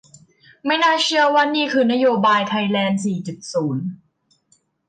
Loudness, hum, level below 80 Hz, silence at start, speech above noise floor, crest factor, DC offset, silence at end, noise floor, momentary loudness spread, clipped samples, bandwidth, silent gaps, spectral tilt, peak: -18 LUFS; none; -68 dBFS; 0.65 s; 46 dB; 14 dB; under 0.1%; 0.95 s; -64 dBFS; 11 LU; under 0.1%; 9.4 kHz; none; -4.5 dB/octave; -6 dBFS